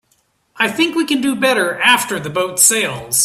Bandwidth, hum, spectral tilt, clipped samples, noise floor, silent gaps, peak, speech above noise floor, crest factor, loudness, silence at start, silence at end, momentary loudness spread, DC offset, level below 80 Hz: 16 kHz; none; -1.5 dB/octave; under 0.1%; -61 dBFS; none; 0 dBFS; 46 dB; 16 dB; -14 LUFS; 0.55 s; 0 s; 8 LU; under 0.1%; -58 dBFS